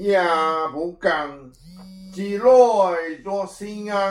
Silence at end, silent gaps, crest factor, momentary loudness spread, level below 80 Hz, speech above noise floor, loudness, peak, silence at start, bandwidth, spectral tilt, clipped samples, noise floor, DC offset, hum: 0 s; none; 18 dB; 17 LU; -56 dBFS; 21 dB; -20 LUFS; -4 dBFS; 0 s; 11.5 kHz; -5 dB/octave; under 0.1%; -41 dBFS; under 0.1%; none